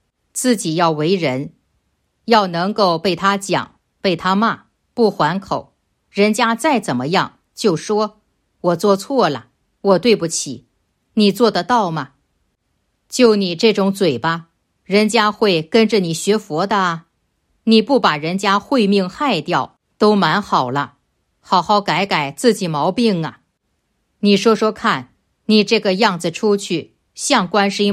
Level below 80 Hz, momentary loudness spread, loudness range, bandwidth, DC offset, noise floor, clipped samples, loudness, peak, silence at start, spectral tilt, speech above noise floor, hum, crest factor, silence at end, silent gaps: -60 dBFS; 11 LU; 2 LU; 15 kHz; under 0.1%; -69 dBFS; under 0.1%; -17 LUFS; 0 dBFS; 0.35 s; -4.5 dB/octave; 53 dB; none; 16 dB; 0 s; none